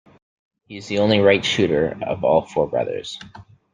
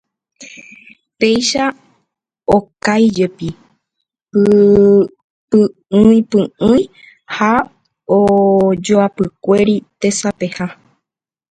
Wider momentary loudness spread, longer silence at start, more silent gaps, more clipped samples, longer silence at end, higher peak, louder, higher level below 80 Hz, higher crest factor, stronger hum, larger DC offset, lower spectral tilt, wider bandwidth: about the same, 18 LU vs 16 LU; first, 0.7 s vs 0.4 s; second, none vs 5.24-5.48 s; neither; second, 0.3 s vs 0.8 s; about the same, -2 dBFS vs 0 dBFS; second, -19 LUFS vs -13 LUFS; second, -54 dBFS vs -46 dBFS; about the same, 18 dB vs 14 dB; neither; neither; about the same, -5.5 dB/octave vs -5.5 dB/octave; about the same, 9.6 kHz vs 9.4 kHz